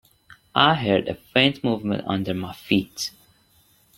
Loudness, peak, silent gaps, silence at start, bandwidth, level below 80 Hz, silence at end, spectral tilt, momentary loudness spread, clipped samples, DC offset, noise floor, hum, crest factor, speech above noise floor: -22 LUFS; 0 dBFS; none; 0.55 s; 16.5 kHz; -58 dBFS; 0.9 s; -5 dB/octave; 12 LU; under 0.1%; under 0.1%; -59 dBFS; none; 24 dB; 37 dB